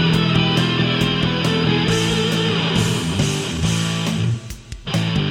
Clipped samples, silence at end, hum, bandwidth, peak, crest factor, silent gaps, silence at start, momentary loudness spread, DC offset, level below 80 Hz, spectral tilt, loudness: under 0.1%; 0 s; none; 16 kHz; -4 dBFS; 14 dB; none; 0 s; 6 LU; under 0.1%; -38 dBFS; -5 dB/octave; -18 LUFS